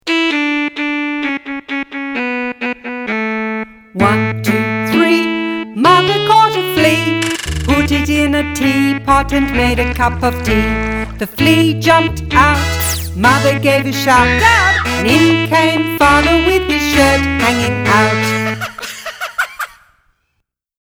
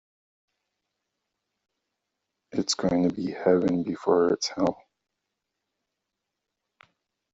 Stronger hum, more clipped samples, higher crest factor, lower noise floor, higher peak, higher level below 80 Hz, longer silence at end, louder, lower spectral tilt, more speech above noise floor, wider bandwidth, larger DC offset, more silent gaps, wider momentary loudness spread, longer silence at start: neither; neither; second, 14 dB vs 22 dB; second, -69 dBFS vs -84 dBFS; first, 0 dBFS vs -8 dBFS; first, -28 dBFS vs -64 dBFS; second, 1.15 s vs 2.6 s; first, -13 LUFS vs -25 LUFS; about the same, -4.5 dB/octave vs -5 dB/octave; about the same, 58 dB vs 60 dB; first, over 20 kHz vs 8 kHz; neither; neither; first, 11 LU vs 6 LU; second, 0.05 s vs 2.55 s